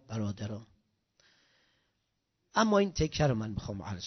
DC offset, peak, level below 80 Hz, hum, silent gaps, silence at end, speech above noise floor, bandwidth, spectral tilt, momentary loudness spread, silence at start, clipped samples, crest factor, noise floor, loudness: under 0.1%; -12 dBFS; -52 dBFS; none; none; 0 s; 50 dB; 6.4 kHz; -5.5 dB/octave; 13 LU; 0.1 s; under 0.1%; 22 dB; -81 dBFS; -31 LUFS